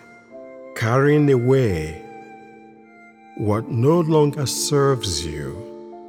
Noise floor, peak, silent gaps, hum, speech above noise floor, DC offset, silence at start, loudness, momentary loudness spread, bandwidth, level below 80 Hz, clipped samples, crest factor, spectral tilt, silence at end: -47 dBFS; -4 dBFS; none; none; 28 dB; under 0.1%; 0.3 s; -19 LUFS; 21 LU; 17 kHz; -46 dBFS; under 0.1%; 16 dB; -5.5 dB/octave; 0 s